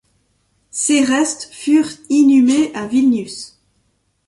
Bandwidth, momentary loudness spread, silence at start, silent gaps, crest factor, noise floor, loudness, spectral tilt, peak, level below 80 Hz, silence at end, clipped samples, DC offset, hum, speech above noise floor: 11.5 kHz; 17 LU; 0.75 s; none; 14 dB; -64 dBFS; -15 LUFS; -3 dB/octave; -2 dBFS; -60 dBFS; 0.8 s; under 0.1%; under 0.1%; none; 49 dB